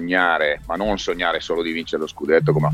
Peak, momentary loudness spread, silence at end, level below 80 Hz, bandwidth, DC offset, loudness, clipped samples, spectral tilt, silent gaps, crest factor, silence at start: -2 dBFS; 8 LU; 0 s; -44 dBFS; 13 kHz; under 0.1%; -21 LUFS; under 0.1%; -6 dB/octave; none; 18 dB; 0 s